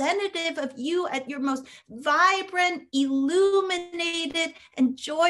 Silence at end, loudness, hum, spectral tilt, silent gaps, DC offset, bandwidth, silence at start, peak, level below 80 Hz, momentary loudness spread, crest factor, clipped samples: 0 s; -25 LUFS; none; -2 dB/octave; none; under 0.1%; 12 kHz; 0 s; -8 dBFS; -72 dBFS; 9 LU; 18 dB; under 0.1%